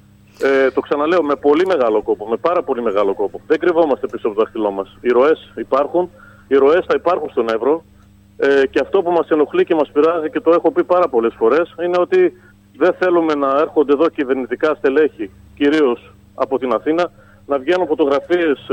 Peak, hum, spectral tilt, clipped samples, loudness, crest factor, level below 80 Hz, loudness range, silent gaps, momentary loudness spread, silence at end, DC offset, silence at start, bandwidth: 0 dBFS; none; -6.5 dB/octave; under 0.1%; -16 LUFS; 16 dB; -54 dBFS; 2 LU; none; 6 LU; 0 s; under 0.1%; 0.4 s; 8.4 kHz